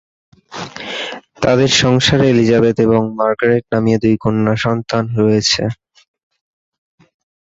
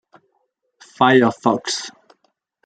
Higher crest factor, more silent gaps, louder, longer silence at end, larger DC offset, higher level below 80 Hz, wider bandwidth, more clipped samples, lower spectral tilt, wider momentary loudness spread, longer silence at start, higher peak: about the same, 16 dB vs 20 dB; neither; first, -14 LUFS vs -17 LUFS; first, 1.85 s vs 0.75 s; neither; first, -44 dBFS vs -64 dBFS; second, 8 kHz vs 9.4 kHz; neither; about the same, -5 dB/octave vs -4.5 dB/octave; about the same, 14 LU vs 12 LU; second, 0.5 s vs 1 s; about the same, 0 dBFS vs -2 dBFS